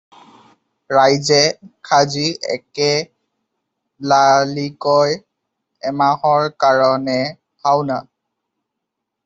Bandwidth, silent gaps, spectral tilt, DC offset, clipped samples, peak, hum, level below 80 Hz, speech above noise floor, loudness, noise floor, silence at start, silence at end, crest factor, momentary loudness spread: 8 kHz; none; -4 dB/octave; under 0.1%; under 0.1%; -2 dBFS; none; -62 dBFS; 63 dB; -16 LUFS; -79 dBFS; 0.9 s; 1.25 s; 16 dB; 12 LU